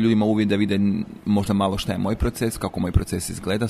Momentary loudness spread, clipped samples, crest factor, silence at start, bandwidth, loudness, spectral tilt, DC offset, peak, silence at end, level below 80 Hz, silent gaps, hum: 6 LU; under 0.1%; 18 dB; 0 s; 15 kHz; -23 LUFS; -6 dB/octave; under 0.1%; -4 dBFS; 0 s; -34 dBFS; none; none